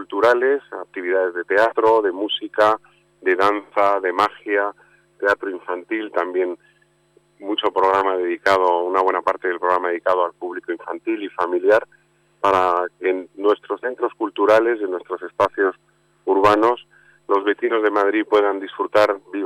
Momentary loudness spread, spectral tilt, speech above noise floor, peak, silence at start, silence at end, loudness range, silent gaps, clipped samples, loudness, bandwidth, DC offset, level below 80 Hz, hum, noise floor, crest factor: 10 LU; -4.5 dB/octave; 39 dB; -6 dBFS; 0 s; 0 s; 3 LU; none; under 0.1%; -20 LUFS; 12.5 kHz; under 0.1%; -62 dBFS; none; -59 dBFS; 14 dB